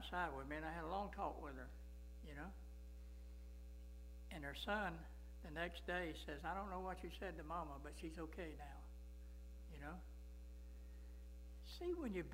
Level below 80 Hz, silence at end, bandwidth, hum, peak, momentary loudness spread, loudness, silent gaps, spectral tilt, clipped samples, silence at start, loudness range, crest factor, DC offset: -56 dBFS; 0 s; 16 kHz; none; -28 dBFS; 13 LU; -51 LUFS; none; -5.5 dB/octave; under 0.1%; 0 s; 8 LU; 22 dB; under 0.1%